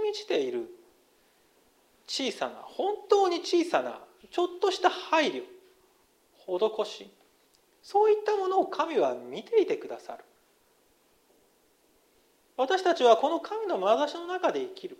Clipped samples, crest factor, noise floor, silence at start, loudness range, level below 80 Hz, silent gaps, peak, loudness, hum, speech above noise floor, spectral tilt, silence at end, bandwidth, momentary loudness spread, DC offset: under 0.1%; 20 dB; -66 dBFS; 0 s; 6 LU; -80 dBFS; none; -8 dBFS; -28 LUFS; none; 38 dB; -3 dB/octave; 0.05 s; 14 kHz; 16 LU; under 0.1%